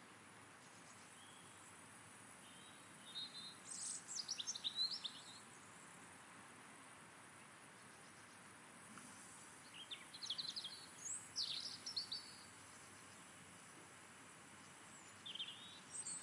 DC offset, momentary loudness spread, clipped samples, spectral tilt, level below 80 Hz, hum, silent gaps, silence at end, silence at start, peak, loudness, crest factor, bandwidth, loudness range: under 0.1%; 16 LU; under 0.1%; 0 dB/octave; under -90 dBFS; none; none; 0 s; 0 s; -32 dBFS; -50 LUFS; 22 dB; 12 kHz; 12 LU